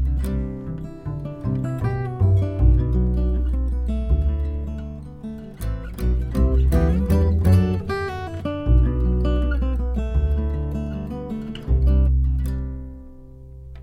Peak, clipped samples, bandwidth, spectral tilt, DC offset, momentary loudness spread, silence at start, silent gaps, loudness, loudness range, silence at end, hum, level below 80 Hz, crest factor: -6 dBFS; under 0.1%; 15.5 kHz; -9 dB/octave; under 0.1%; 13 LU; 0 s; none; -23 LUFS; 4 LU; 0 s; none; -22 dBFS; 14 dB